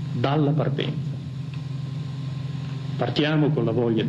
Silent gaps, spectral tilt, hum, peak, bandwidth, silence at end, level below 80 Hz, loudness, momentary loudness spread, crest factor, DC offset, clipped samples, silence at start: none; -8 dB/octave; none; -8 dBFS; 7.6 kHz; 0 s; -58 dBFS; -25 LUFS; 10 LU; 16 dB; under 0.1%; under 0.1%; 0 s